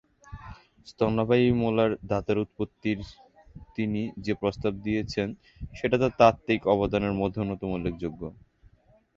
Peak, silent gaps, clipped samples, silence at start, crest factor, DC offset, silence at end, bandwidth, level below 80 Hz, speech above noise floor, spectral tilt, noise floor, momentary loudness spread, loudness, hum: -4 dBFS; none; under 0.1%; 0.3 s; 24 dB; under 0.1%; 0.85 s; 7.6 kHz; -48 dBFS; 33 dB; -7.5 dB/octave; -60 dBFS; 19 LU; -27 LUFS; none